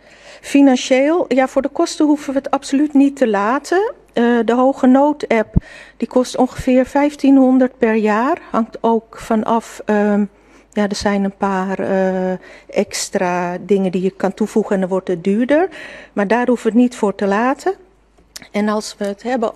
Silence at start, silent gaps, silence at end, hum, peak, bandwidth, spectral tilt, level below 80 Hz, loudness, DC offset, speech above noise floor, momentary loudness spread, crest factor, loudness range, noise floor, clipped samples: 0.25 s; none; 0.05 s; none; 0 dBFS; 13 kHz; -5.5 dB/octave; -40 dBFS; -16 LUFS; under 0.1%; 36 dB; 9 LU; 16 dB; 4 LU; -52 dBFS; under 0.1%